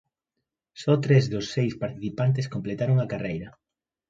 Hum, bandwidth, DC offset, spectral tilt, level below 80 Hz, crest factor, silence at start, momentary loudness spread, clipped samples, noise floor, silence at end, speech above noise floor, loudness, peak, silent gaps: none; 7.6 kHz; under 0.1%; -7.5 dB/octave; -58 dBFS; 18 dB; 0.75 s; 11 LU; under 0.1%; -84 dBFS; 0.6 s; 59 dB; -26 LUFS; -8 dBFS; none